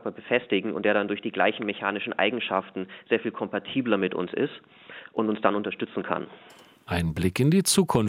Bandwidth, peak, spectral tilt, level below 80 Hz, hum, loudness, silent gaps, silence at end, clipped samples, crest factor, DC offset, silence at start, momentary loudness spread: 16.5 kHz; -4 dBFS; -4.5 dB/octave; -58 dBFS; none; -26 LUFS; none; 0 s; under 0.1%; 22 dB; under 0.1%; 0.05 s; 10 LU